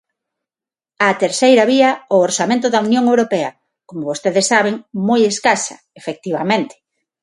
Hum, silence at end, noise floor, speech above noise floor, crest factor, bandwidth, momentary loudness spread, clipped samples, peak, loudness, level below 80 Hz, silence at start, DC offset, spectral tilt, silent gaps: none; 0.55 s; under -90 dBFS; over 75 dB; 16 dB; 11.5 kHz; 14 LU; under 0.1%; 0 dBFS; -15 LUFS; -64 dBFS; 1 s; under 0.1%; -3.5 dB/octave; none